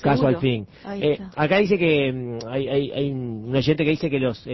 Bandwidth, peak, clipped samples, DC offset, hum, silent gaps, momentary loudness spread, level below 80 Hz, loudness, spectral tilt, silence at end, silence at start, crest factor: 6 kHz; -8 dBFS; under 0.1%; under 0.1%; none; none; 9 LU; -50 dBFS; -22 LUFS; -7.5 dB/octave; 0 s; 0 s; 14 dB